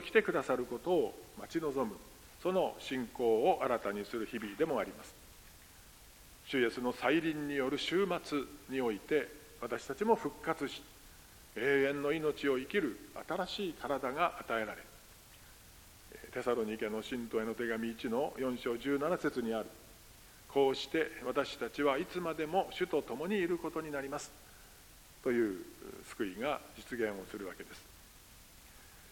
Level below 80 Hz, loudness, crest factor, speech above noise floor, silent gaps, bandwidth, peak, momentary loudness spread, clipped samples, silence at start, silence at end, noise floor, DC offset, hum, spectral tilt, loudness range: -64 dBFS; -36 LUFS; 24 dB; 22 dB; none; 17 kHz; -12 dBFS; 24 LU; under 0.1%; 0 s; 0 s; -58 dBFS; under 0.1%; none; -5 dB/octave; 5 LU